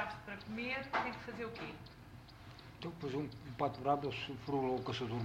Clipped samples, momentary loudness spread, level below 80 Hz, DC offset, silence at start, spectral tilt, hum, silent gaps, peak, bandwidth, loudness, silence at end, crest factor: under 0.1%; 18 LU; -64 dBFS; under 0.1%; 0 s; -6.5 dB/octave; none; none; -20 dBFS; 16 kHz; -40 LUFS; 0 s; 20 dB